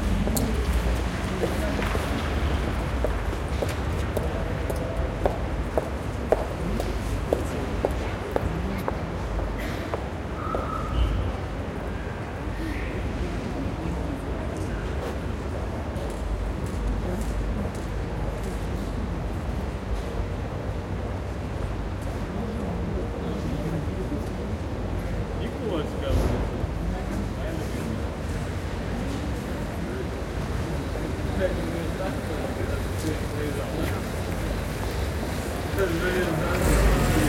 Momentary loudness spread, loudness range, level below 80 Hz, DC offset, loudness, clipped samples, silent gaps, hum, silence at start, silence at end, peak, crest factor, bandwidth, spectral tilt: 5 LU; 3 LU; -32 dBFS; under 0.1%; -29 LUFS; under 0.1%; none; none; 0 s; 0 s; -4 dBFS; 22 dB; 16.5 kHz; -6 dB/octave